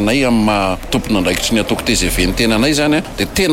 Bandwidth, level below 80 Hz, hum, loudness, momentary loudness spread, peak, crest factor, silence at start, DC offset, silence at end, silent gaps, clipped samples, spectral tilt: 16.5 kHz; -28 dBFS; none; -14 LUFS; 4 LU; -2 dBFS; 12 dB; 0 s; under 0.1%; 0 s; none; under 0.1%; -4 dB/octave